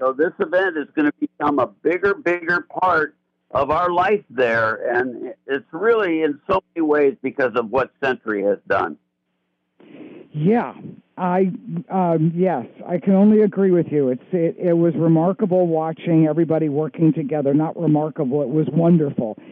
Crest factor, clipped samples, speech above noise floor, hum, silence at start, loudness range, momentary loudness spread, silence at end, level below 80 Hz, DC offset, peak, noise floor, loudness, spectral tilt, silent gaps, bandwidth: 12 dB; under 0.1%; 53 dB; none; 0 s; 6 LU; 7 LU; 0 s; -58 dBFS; under 0.1%; -6 dBFS; -72 dBFS; -19 LUFS; -9.5 dB/octave; none; 6.2 kHz